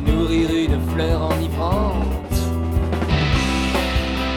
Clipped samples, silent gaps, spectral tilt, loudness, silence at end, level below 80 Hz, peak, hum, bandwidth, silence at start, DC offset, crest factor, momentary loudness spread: under 0.1%; none; -6 dB/octave; -20 LUFS; 0 s; -24 dBFS; -6 dBFS; none; 17.5 kHz; 0 s; under 0.1%; 14 dB; 3 LU